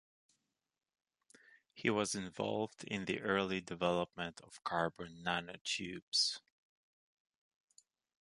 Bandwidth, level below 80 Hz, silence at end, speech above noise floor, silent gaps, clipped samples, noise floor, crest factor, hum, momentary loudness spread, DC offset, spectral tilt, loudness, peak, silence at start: 11.5 kHz; -72 dBFS; 1.85 s; 43 dB; 5.61-5.65 s, 6.02-6.12 s; under 0.1%; -82 dBFS; 24 dB; none; 9 LU; under 0.1%; -3.5 dB/octave; -38 LUFS; -18 dBFS; 1.75 s